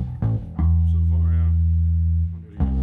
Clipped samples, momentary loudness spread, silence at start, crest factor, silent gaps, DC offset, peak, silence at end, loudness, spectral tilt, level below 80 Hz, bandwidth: under 0.1%; 5 LU; 0 s; 10 dB; none; under 0.1%; -10 dBFS; 0 s; -21 LUFS; -12 dB/octave; -24 dBFS; 2.1 kHz